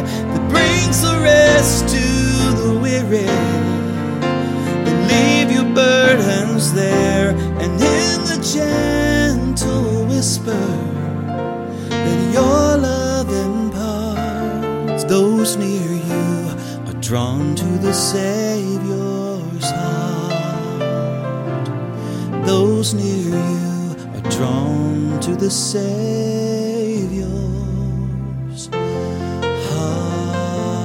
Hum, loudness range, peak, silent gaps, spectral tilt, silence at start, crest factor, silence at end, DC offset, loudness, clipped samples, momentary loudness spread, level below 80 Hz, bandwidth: none; 7 LU; 0 dBFS; none; -5 dB/octave; 0 s; 16 dB; 0 s; under 0.1%; -17 LUFS; under 0.1%; 9 LU; -34 dBFS; 16.5 kHz